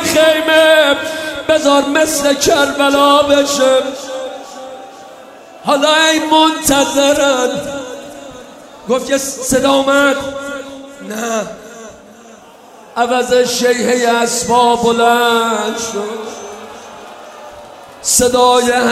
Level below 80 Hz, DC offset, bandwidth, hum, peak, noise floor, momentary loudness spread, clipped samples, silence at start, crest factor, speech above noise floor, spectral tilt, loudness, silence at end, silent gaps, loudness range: -46 dBFS; under 0.1%; 16 kHz; none; 0 dBFS; -39 dBFS; 22 LU; under 0.1%; 0 s; 14 dB; 27 dB; -2 dB/octave; -12 LUFS; 0 s; none; 6 LU